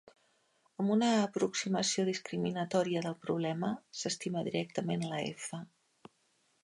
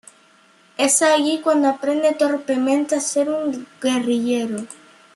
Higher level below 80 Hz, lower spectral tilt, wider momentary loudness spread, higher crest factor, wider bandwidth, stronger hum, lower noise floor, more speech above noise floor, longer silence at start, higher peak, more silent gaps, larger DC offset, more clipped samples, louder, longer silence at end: second, -78 dBFS vs -72 dBFS; first, -4.5 dB/octave vs -2.5 dB/octave; second, 8 LU vs 11 LU; about the same, 18 dB vs 16 dB; about the same, 11.5 kHz vs 12.5 kHz; neither; first, -74 dBFS vs -54 dBFS; first, 41 dB vs 35 dB; about the same, 0.8 s vs 0.8 s; second, -18 dBFS vs -4 dBFS; neither; neither; neither; second, -34 LUFS vs -19 LUFS; first, 1 s vs 0.4 s